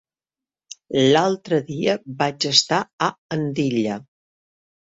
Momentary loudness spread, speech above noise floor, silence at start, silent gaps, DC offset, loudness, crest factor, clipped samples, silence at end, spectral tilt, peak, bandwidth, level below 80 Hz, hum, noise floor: 9 LU; over 69 dB; 0.9 s; 2.93-2.98 s, 3.18-3.29 s; under 0.1%; -20 LUFS; 22 dB; under 0.1%; 0.85 s; -4 dB/octave; 0 dBFS; 8 kHz; -62 dBFS; none; under -90 dBFS